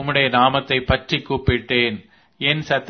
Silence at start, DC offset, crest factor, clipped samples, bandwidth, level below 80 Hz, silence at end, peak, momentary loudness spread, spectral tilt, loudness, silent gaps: 0 s; under 0.1%; 20 dB; under 0.1%; 6.6 kHz; -38 dBFS; 0 s; 0 dBFS; 7 LU; -6 dB/octave; -19 LUFS; none